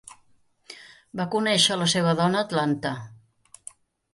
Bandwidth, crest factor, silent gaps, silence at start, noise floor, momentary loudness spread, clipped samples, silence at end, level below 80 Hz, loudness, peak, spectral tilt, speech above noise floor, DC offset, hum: 11.5 kHz; 20 dB; none; 0.7 s; -61 dBFS; 24 LU; under 0.1%; 1 s; -66 dBFS; -23 LUFS; -6 dBFS; -4 dB/octave; 38 dB; under 0.1%; none